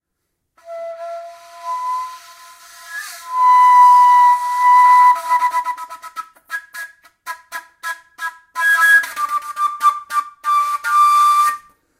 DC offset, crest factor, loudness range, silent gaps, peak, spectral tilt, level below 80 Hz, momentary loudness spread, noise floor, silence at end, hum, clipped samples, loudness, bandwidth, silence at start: under 0.1%; 14 dB; 12 LU; none; -2 dBFS; 2.5 dB/octave; -72 dBFS; 23 LU; -74 dBFS; 0.4 s; none; under 0.1%; -13 LUFS; 16 kHz; 0.65 s